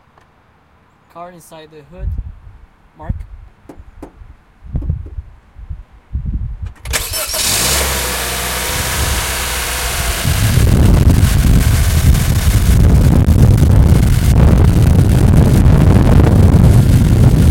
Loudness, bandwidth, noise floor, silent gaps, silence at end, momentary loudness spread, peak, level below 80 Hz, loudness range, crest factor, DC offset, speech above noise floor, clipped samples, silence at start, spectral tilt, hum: -12 LUFS; 17 kHz; -50 dBFS; none; 0 s; 18 LU; 0 dBFS; -16 dBFS; 21 LU; 12 dB; under 0.1%; 25 dB; 0.3%; 1.15 s; -5.5 dB/octave; none